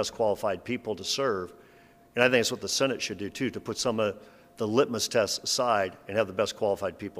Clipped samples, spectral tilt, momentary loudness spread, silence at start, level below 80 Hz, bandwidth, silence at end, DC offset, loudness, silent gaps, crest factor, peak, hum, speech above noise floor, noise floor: under 0.1%; -3 dB/octave; 8 LU; 0 s; -64 dBFS; 15.5 kHz; 0 s; under 0.1%; -28 LUFS; none; 22 dB; -6 dBFS; none; 28 dB; -56 dBFS